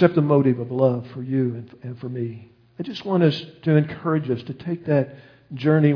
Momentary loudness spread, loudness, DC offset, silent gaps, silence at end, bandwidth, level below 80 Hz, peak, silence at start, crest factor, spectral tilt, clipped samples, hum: 15 LU; -23 LUFS; under 0.1%; none; 0 s; 5.4 kHz; -64 dBFS; -2 dBFS; 0 s; 18 dB; -9.5 dB/octave; under 0.1%; none